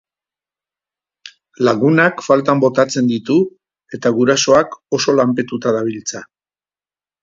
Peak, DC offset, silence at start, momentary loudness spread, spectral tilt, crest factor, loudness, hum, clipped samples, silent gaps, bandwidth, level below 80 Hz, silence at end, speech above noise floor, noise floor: 0 dBFS; under 0.1%; 1.25 s; 10 LU; -4.5 dB/octave; 16 dB; -15 LUFS; none; under 0.1%; none; 7.8 kHz; -60 dBFS; 1 s; over 75 dB; under -90 dBFS